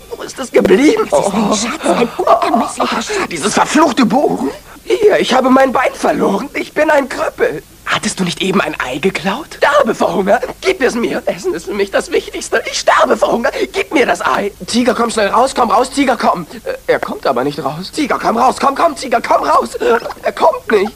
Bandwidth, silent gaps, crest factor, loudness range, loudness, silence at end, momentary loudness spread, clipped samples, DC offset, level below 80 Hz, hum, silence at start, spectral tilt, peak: 16 kHz; none; 14 dB; 2 LU; -13 LUFS; 0 s; 8 LU; under 0.1%; under 0.1%; -44 dBFS; none; 0 s; -4 dB/octave; 0 dBFS